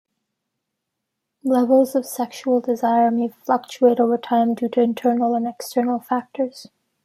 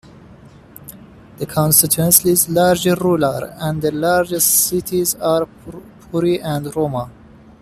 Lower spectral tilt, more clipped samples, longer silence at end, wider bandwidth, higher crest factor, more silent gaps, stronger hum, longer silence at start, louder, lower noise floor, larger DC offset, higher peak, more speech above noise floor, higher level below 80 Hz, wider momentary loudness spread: first, -5.5 dB/octave vs -4 dB/octave; neither; about the same, 0.4 s vs 0.5 s; about the same, 15 kHz vs 15.5 kHz; about the same, 16 dB vs 18 dB; neither; neither; first, 1.45 s vs 0.3 s; second, -20 LUFS vs -15 LUFS; first, -80 dBFS vs -42 dBFS; neither; second, -4 dBFS vs 0 dBFS; first, 60 dB vs 26 dB; second, -74 dBFS vs -48 dBFS; second, 9 LU vs 15 LU